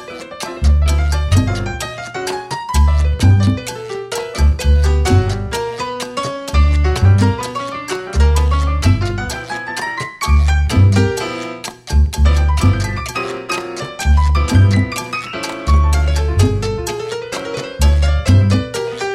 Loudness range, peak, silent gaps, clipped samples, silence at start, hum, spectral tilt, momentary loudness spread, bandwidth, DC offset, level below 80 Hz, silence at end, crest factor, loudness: 2 LU; 0 dBFS; none; under 0.1%; 0 s; none; -6 dB/octave; 11 LU; 13 kHz; under 0.1%; -18 dBFS; 0 s; 14 dB; -16 LUFS